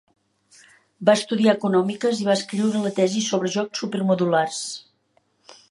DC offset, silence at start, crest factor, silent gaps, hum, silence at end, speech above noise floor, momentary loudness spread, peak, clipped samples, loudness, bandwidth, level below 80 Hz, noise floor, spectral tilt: under 0.1%; 1 s; 20 dB; none; none; 0.9 s; 45 dB; 7 LU; -2 dBFS; under 0.1%; -22 LUFS; 11.5 kHz; -74 dBFS; -66 dBFS; -5 dB/octave